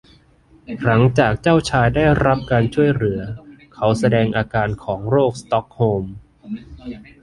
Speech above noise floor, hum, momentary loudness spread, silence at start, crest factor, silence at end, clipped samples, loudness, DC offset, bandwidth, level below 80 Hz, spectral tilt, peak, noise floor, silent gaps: 34 dB; none; 18 LU; 0.7 s; 16 dB; 0.2 s; under 0.1%; -18 LUFS; under 0.1%; 11.5 kHz; -40 dBFS; -7 dB/octave; -2 dBFS; -52 dBFS; none